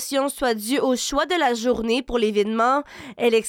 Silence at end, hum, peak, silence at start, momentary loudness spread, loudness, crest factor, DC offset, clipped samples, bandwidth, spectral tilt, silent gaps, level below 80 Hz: 0 s; none; -10 dBFS; 0 s; 4 LU; -22 LUFS; 12 dB; under 0.1%; under 0.1%; 17.5 kHz; -3 dB/octave; none; -48 dBFS